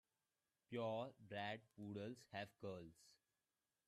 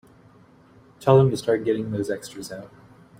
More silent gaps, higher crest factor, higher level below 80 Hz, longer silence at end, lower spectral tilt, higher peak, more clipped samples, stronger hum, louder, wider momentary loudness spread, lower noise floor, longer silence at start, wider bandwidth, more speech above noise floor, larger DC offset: neither; about the same, 20 dB vs 22 dB; second, -88 dBFS vs -58 dBFS; first, 0.75 s vs 0.55 s; about the same, -6 dB/octave vs -7 dB/octave; second, -34 dBFS vs -2 dBFS; neither; neither; second, -51 LUFS vs -22 LUFS; second, 7 LU vs 19 LU; first, under -90 dBFS vs -53 dBFS; second, 0.7 s vs 1 s; second, 13.5 kHz vs 16 kHz; first, over 39 dB vs 31 dB; neither